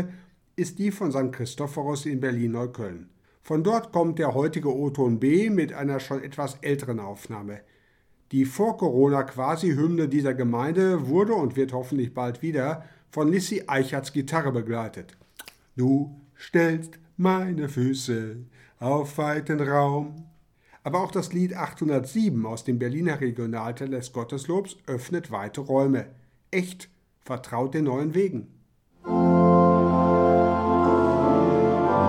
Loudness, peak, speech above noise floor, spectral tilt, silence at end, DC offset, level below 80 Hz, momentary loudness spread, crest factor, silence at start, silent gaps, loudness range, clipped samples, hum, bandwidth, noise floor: -25 LUFS; -6 dBFS; 37 dB; -7 dB/octave; 0 s; under 0.1%; -56 dBFS; 15 LU; 18 dB; 0 s; none; 7 LU; under 0.1%; none; 15.5 kHz; -62 dBFS